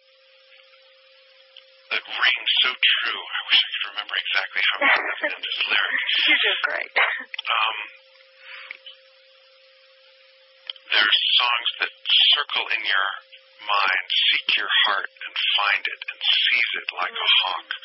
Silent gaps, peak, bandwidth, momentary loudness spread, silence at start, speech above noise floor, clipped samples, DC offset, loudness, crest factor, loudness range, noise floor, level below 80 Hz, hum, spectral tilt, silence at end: none; -6 dBFS; 5.8 kHz; 12 LU; 1.9 s; 33 dB; under 0.1%; under 0.1%; -20 LUFS; 18 dB; 7 LU; -55 dBFS; under -90 dBFS; none; -2.5 dB/octave; 0.05 s